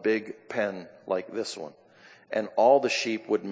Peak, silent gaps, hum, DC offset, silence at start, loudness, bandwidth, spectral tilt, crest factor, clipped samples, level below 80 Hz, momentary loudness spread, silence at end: -8 dBFS; none; none; under 0.1%; 0 s; -27 LUFS; 8 kHz; -4 dB/octave; 20 dB; under 0.1%; -78 dBFS; 15 LU; 0 s